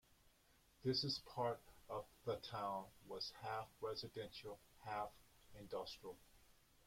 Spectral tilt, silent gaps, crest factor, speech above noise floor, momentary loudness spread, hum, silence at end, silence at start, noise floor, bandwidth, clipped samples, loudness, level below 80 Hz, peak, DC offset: -5 dB/octave; none; 20 dB; 27 dB; 14 LU; none; 0.35 s; 0.25 s; -74 dBFS; 16.5 kHz; under 0.1%; -47 LUFS; -74 dBFS; -30 dBFS; under 0.1%